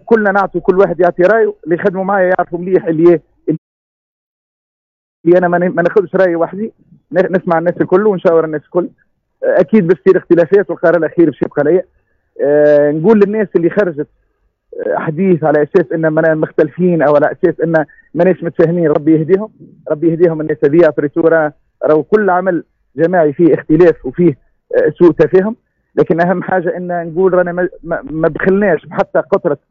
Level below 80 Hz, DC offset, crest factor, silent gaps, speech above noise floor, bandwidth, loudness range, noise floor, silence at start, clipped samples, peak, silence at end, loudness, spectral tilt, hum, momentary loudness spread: -48 dBFS; under 0.1%; 12 dB; 3.58-5.24 s; 49 dB; 5.4 kHz; 3 LU; -61 dBFS; 0.05 s; under 0.1%; 0 dBFS; 0.15 s; -12 LUFS; -10 dB/octave; none; 9 LU